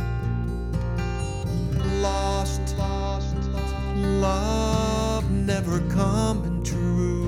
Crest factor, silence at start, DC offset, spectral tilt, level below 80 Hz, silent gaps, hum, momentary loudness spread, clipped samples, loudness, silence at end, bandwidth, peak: 14 dB; 0 s; under 0.1%; -6.5 dB/octave; -30 dBFS; none; none; 5 LU; under 0.1%; -25 LUFS; 0 s; 14.5 kHz; -10 dBFS